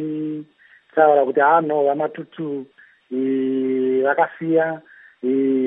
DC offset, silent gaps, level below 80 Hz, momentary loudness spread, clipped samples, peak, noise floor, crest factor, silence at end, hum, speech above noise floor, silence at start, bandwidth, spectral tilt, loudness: under 0.1%; none; -78 dBFS; 14 LU; under 0.1%; -2 dBFS; -53 dBFS; 18 dB; 0 s; none; 34 dB; 0 s; 3.9 kHz; -10.5 dB/octave; -20 LUFS